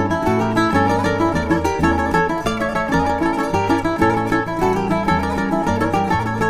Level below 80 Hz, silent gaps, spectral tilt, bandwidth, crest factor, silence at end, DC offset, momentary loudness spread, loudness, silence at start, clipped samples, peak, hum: -34 dBFS; none; -6.5 dB/octave; 15.5 kHz; 14 dB; 0 s; under 0.1%; 3 LU; -18 LUFS; 0 s; under 0.1%; -4 dBFS; none